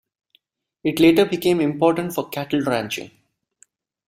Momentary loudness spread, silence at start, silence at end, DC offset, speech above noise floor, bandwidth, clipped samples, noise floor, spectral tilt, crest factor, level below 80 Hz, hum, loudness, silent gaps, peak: 12 LU; 0.85 s; 1 s; under 0.1%; 44 dB; 16 kHz; under 0.1%; -64 dBFS; -5.5 dB/octave; 18 dB; -58 dBFS; none; -20 LUFS; none; -4 dBFS